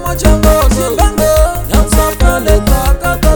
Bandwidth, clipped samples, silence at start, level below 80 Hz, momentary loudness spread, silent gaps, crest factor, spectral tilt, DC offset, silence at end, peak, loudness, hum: over 20 kHz; 0.7%; 0 s; -12 dBFS; 3 LU; none; 10 dB; -5 dB/octave; under 0.1%; 0 s; 0 dBFS; -11 LUFS; none